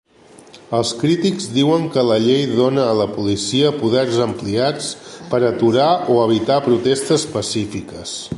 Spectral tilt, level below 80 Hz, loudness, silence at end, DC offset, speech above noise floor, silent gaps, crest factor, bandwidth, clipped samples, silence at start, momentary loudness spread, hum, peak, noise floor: -5 dB/octave; -50 dBFS; -17 LUFS; 0 s; under 0.1%; 28 dB; none; 16 dB; 11.5 kHz; under 0.1%; 0.55 s; 8 LU; none; -2 dBFS; -45 dBFS